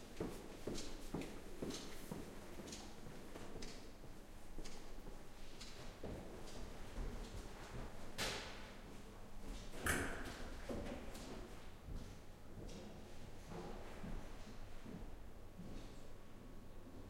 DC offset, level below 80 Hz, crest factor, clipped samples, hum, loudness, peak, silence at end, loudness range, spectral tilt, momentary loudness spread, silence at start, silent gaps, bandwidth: under 0.1%; -54 dBFS; 26 dB; under 0.1%; none; -51 LUFS; -22 dBFS; 0 s; 8 LU; -4 dB/octave; 13 LU; 0 s; none; 16 kHz